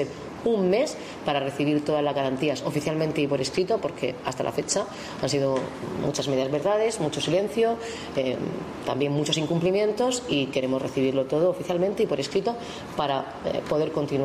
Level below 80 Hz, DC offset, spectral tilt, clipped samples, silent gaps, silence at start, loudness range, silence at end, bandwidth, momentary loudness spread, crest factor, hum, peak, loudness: -56 dBFS; under 0.1%; -5 dB/octave; under 0.1%; none; 0 s; 2 LU; 0 s; 15 kHz; 7 LU; 14 dB; none; -12 dBFS; -26 LUFS